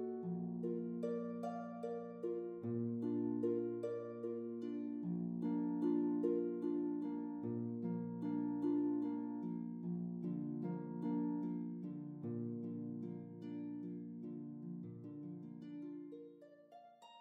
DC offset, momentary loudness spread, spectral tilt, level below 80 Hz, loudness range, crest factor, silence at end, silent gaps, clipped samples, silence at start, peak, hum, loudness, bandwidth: under 0.1%; 12 LU; -10.5 dB/octave; -86 dBFS; 9 LU; 16 dB; 0 s; none; under 0.1%; 0 s; -26 dBFS; none; -43 LUFS; 4.4 kHz